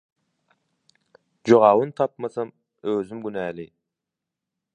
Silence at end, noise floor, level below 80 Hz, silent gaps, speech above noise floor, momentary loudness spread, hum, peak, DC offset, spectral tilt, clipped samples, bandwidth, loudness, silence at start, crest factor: 1.1 s; -86 dBFS; -68 dBFS; none; 65 dB; 19 LU; none; -2 dBFS; under 0.1%; -7 dB/octave; under 0.1%; 9.4 kHz; -22 LUFS; 1.45 s; 22 dB